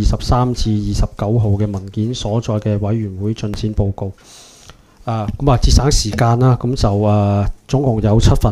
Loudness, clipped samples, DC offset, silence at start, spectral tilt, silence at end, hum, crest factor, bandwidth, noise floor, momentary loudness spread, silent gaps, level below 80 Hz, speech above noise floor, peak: -17 LUFS; under 0.1%; under 0.1%; 0 s; -6.5 dB/octave; 0 s; none; 16 dB; 13 kHz; -43 dBFS; 9 LU; none; -22 dBFS; 28 dB; 0 dBFS